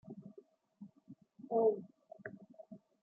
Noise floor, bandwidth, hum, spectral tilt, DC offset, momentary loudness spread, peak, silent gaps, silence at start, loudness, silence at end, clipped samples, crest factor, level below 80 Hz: -63 dBFS; 2.1 kHz; none; -10.5 dB/octave; under 0.1%; 25 LU; -22 dBFS; none; 0.05 s; -35 LUFS; 0.25 s; under 0.1%; 20 dB; -90 dBFS